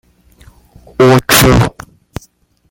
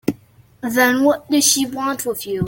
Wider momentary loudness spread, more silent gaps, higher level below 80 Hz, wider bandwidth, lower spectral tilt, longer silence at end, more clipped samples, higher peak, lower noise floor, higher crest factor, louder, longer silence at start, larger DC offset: first, 24 LU vs 12 LU; neither; first, -28 dBFS vs -56 dBFS; first, over 20 kHz vs 17 kHz; first, -4.5 dB/octave vs -3 dB/octave; first, 1 s vs 0 s; first, 0.1% vs under 0.1%; about the same, 0 dBFS vs 0 dBFS; about the same, -50 dBFS vs -49 dBFS; about the same, 14 dB vs 18 dB; first, -9 LUFS vs -17 LUFS; first, 1 s vs 0.05 s; neither